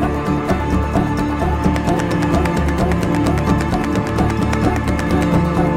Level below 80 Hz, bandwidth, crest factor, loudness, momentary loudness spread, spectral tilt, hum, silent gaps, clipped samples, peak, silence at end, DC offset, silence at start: -24 dBFS; 16 kHz; 14 dB; -17 LUFS; 3 LU; -7 dB/octave; none; none; under 0.1%; -2 dBFS; 0 s; under 0.1%; 0 s